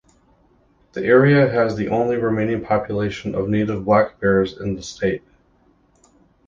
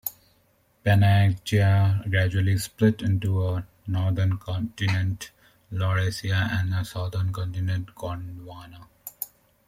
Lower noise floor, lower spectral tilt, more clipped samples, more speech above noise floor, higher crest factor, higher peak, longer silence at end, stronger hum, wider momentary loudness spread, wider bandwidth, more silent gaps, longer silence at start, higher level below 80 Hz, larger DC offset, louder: second, -58 dBFS vs -64 dBFS; about the same, -7.5 dB/octave vs -6.5 dB/octave; neither; about the same, 39 dB vs 41 dB; about the same, 18 dB vs 16 dB; first, -2 dBFS vs -8 dBFS; first, 1.3 s vs 0.45 s; neither; second, 11 LU vs 15 LU; second, 7.6 kHz vs 15.5 kHz; neither; first, 0.95 s vs 0.05 s; about the same, -48 dBFS vs -52 dBFS; neither; first, -19 LUFS vs -25 LUFS